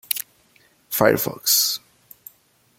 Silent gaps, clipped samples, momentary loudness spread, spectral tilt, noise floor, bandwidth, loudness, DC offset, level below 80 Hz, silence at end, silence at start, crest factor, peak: none; under 0.1%; 12 LU; -2 dB/octave; -59 dBFS; 17 kHz; -20 LUFS; under 0.1%; -60 dBFS; 1 s; 0.1 s; 24 dB; 0 dBFS